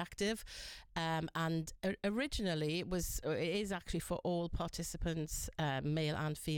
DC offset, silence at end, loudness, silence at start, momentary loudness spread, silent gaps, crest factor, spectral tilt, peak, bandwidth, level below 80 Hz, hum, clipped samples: under 0.1%; 0 s; -39 LUFS; 0 s; 4 LU; none; 12 dB; -5 dB/octave; -26 dBFS; 17 kHz; -50 dBFS; none; under 0.1%